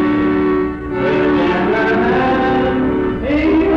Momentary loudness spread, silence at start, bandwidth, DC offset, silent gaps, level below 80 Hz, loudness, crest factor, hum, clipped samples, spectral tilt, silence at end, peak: 4 LU; 0 s; 6.6 kHz; under 0.1%; none; -32 dBFS; -15 LUFS; 8 dB; none; under 0.1%; -8 dB/octave; 0 s; -8 dBFS